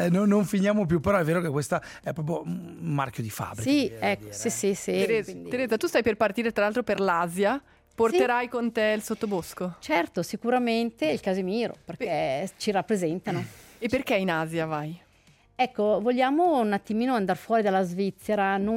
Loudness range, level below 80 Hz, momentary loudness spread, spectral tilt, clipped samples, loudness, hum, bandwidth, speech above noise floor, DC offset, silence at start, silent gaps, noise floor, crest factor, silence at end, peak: 3 LU; -58 dBFS; 10 LU; -5.5 dB/octave; under 0.1%; -26 LUFS; none; 16.5 kHz; 34 dB; under 0.1%; 0 s; none; -60 dBFS; 16 dB; 0 s; -10 dBFS